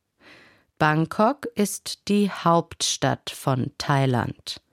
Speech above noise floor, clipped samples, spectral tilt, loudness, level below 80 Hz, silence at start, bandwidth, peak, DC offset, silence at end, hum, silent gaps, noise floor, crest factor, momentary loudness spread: 30 dB; under 0.1%; -4.5 dB/octave; -23 LUFS; -58 dBFS; 0.8 s; 16 kHz; -6 dBFS; under 0.1%; 0.15 s; none; none; -54 dBFS; 18 dB; 5 LU